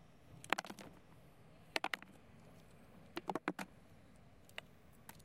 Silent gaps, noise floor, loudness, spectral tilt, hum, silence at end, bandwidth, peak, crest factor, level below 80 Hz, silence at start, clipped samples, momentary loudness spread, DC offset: none; -64 dBFS; -45 LUFS; -3.5 dB/octave; none; 0 s; 16.5 kHz; -12 dBFS; 38 dB; -74 dBFS; 0 s; under 0.1%; 23 LU; under 0.1%